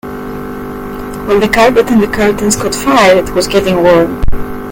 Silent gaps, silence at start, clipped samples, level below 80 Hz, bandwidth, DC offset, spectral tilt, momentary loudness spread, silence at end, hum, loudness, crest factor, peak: none; 0.05 s; 0.5%; -26 dBFS; 17.5 kHz; under 0.1%; -4.5 dB/octave; 15 LU; 0 s; none; -10 LUFS; 10 dB; 0 dBFS